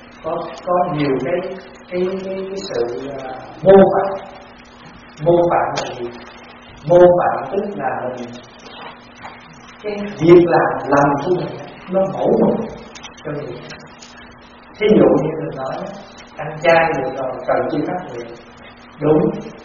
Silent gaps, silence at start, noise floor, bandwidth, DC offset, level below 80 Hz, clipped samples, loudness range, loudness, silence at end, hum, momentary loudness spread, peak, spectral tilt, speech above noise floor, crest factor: none; 0 s; -41 dBFS; 7.2 kHz; under 0.1%; -48 dBFS; under 0.1%; 5 LU; -17 LUFS; 0 s; none; 24 LU; 0 dBFS; -5.5 dB/octave; 25 dB; 18 dB